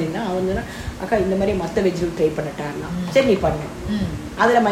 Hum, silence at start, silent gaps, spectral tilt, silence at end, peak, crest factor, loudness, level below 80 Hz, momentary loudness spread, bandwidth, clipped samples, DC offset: none; 0 s; none; -6 dB/octave; 0 s; -2 dBFS; 18 dB; -21 LUFS; -38 dBFS; 10 LU; 16 kHz; under 0.1%; under 0.1%